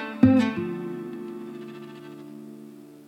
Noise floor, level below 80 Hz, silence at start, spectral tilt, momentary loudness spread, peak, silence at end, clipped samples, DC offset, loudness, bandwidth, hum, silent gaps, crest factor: -45 dBFS; -60 dBFS; 0 s; -8 dB/octave; 23 LU; -4 dBFS; 0 s; under 0.1%; under 0.1%; -25 LUFS; 8.4 kHz; none; none; 22 dB